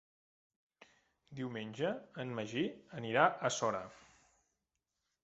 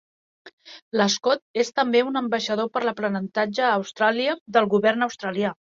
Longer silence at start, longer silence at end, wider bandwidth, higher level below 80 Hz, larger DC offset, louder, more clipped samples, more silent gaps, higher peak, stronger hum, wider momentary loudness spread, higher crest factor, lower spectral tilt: first, 1.3 s vs 0.45 s; first, 1.25 s vs 0.25 s; about the same, 8 kHz vs 7.8 kHz; second, -78 dBFS vs -70 dBFS; neither; second, -37 LUFS vs -23 LUFS; neither; second, none vs 0.53-0.58 s, 0.82-0.91 s, 1.42-1.54 s, 4.41-4.46 s; second, -12 dBFS vs -4 dBFS; neither; first, 14 LU vs 6 LU; first, 26 dB vs 18 dB; about the same, -3.5 dB/octave vs -4 dB/octave